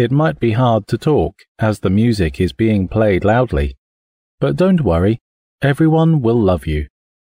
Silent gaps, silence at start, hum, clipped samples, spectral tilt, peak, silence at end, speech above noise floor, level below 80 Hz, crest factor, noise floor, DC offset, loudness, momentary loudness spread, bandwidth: 1.48-1.55 s, 3.78-4.38 s, 5.21-5.59 s; 0 s; none; under 0.1%; -8.5 dB/octave; -4 dBFS; 0.4 s; over 76 dB; -32 dBFS; 12 dB; under -90 dBFS; under 0.1%; -16 LUFS; 8 LU; 15.5 kHz